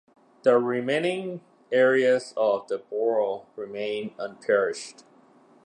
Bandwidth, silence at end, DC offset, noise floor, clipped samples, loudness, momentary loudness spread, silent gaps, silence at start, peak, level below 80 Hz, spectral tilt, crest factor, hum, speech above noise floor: 10 kHz; 0.75 s; under 0.1%; -56 dBFS; under 0.1%; -25 LUFS; 14 LU; none; 0.45 s; -6 dBFS; -80 dBFS; -5 dB/octave; 18 dB; none; 32 dB